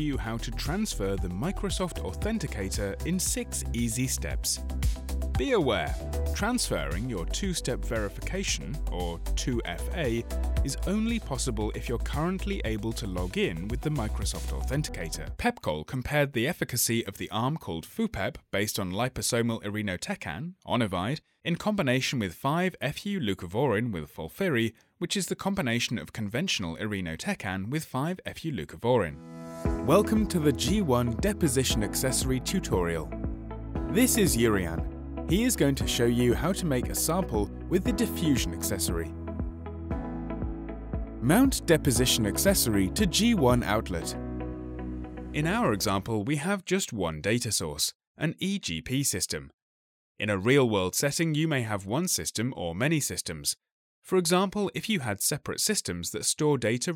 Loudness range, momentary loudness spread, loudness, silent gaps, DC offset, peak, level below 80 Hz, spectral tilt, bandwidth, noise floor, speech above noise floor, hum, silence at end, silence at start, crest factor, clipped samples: 5 LU; 11 LU; -29 LUFS; 47.95-48.00 s, 48.07-48.15 s, 49.54-50.15 s, 53.72-54.02 s; under 0.1%; -10 dBFS; -38 dBFS; -4.5 dB/octave; 17.5 kHz; under -90 dBFS; over 62 dB; none; 0 s; 0 s; 20 dB; under 0.1%